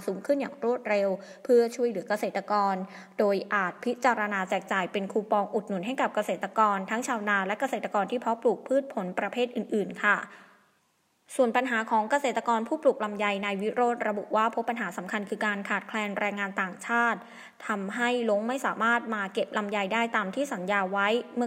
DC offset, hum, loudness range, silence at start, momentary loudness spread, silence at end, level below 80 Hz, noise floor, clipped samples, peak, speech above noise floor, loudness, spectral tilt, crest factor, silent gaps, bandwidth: under 0.1%; none; 2 LU; 0 s; 6 LU; 0 s; -84 dBFS; -70 dBFS; under 0.1%; -8 dBFS; 42 dB; -28 LUFS; -4.5 dB/octave; 20 dB; none; 16 kHz